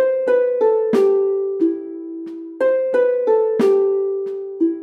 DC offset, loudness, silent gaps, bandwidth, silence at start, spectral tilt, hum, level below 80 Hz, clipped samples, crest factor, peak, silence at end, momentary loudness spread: under 0.1%; -18 LUFS; none; 9 kHz; 0 s; -7 dB/octave; none; -76 dBFS; under 0.1%; 12 dB; -6 dBFS; 0 s; 13 LU